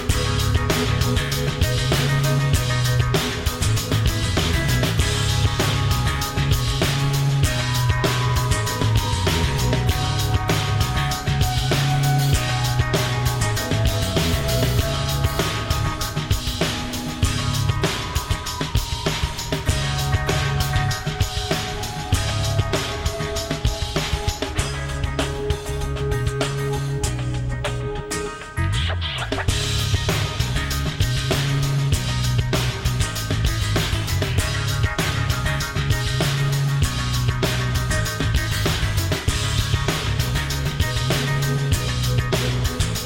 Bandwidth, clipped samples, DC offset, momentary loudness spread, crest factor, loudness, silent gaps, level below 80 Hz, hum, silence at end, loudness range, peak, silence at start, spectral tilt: 17 kHz; under 0.1%; under 0.1%; 5 LU; 14 dB; -22 LUFS; none; -28 dBFS; none; 0 s; 4 LU; -8 dBFS; 0 s; -4.5 dB/octave